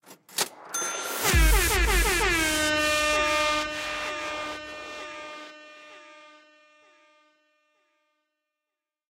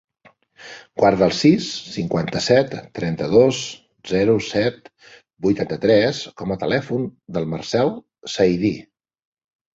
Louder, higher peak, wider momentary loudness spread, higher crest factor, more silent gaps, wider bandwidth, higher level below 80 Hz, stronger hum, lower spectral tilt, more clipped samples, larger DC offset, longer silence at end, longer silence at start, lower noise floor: second, -24 LUFS vs -20 LUFS; second, -10 dBFS vs -2 dBFS; first, 18 LU vs 12 LU; about the same, 18 dB vs 18 dB; neither; first, 16 kHz vs 8 kHz; first, -34 dBFS vs -52 dBFS; neither; second, -2.5 dB/octave vs -5.5 dB/octave; neither; neither; first, 2.9 s vs 0.95 s; second, 0.1 s vs 0.6 s; first, -88 dBFS vs -45 dBFS